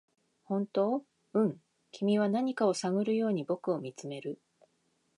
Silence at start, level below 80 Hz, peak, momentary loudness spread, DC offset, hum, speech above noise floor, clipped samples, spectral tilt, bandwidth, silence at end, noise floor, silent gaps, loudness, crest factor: 0.5 s; -84 dBFS; -16 dBFS; 12 LU; under 0.1%; none; 44 dB; under 0.1%; -6.5 dB/octave; 11 kHz; 0.8 s; -75 dBFS; none; -32 LUFS; 18 dB